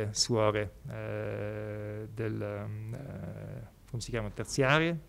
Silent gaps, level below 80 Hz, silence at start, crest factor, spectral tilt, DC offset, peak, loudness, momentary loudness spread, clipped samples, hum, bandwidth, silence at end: none; -54 dBFS; 0 s; 22 dB; -4.5 dB/octave; under 0.1%; -10 dBFS; -33 LUFS; 15 LU; under 0.1%; none; 15.5 kHz; 0 s